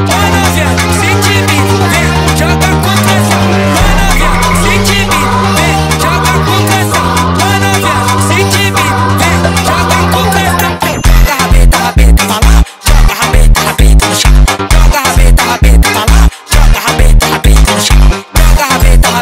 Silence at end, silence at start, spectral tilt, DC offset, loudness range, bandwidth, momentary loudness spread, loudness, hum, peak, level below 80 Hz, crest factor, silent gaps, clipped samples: 0 s; 0 s; -4 dB/octave; under 0.1%; 1 LU; 16.5 kHz; 2 LU; -8 LUFS; none; 0 dBFS; -10 dBFS; 6 dB; none; 0.1%